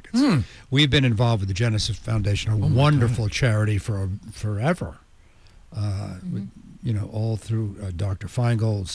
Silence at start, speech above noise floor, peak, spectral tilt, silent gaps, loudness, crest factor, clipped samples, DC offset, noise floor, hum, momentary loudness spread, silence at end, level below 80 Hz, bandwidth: 0.05 s; 29 dB; -8 dBFS; -6 dB/octave; none; -23 LUFS; 16 dB; under 0.1%; under 0.1%; -51 dBFS; none; 13 LU; 0 s; -42 dBFS; 11 kHz